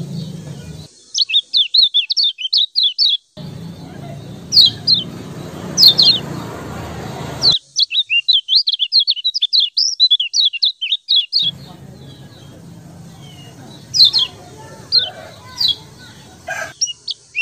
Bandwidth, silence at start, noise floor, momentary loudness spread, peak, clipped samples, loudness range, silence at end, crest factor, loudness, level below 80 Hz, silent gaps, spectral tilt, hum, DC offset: 15.5 kHz; 0 s; -39 dBFS; 22 LU; 0 dBFS; under 0.1%; 5 LU; 0 s; 18 dB; -12 LUFS; -50 dBFS; none; -1.5 dB/octave; none; under 0.1%